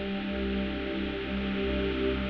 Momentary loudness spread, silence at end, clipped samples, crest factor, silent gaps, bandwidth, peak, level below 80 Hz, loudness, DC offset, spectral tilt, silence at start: 3 LU; 0 s; under 0.1%; 12 dB; none; 6 kHz; -18 dBFS; -40 dBFS; -31 LUFS; under 0.1%; -8 dB/octave; 0 s